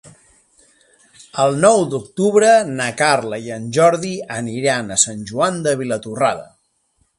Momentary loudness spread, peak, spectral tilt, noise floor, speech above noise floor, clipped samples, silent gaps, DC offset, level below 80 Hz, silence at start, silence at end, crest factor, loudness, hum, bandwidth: 12 LU; 0 dBFS; -3.5 dB/octave; -64 dBFS; 47 dB; under 0.1%; none; under 0.1%; -58 dBFS; 0.05 s; 0.75 s; 18 dB; -17 LUFS; none; 11.5 kHz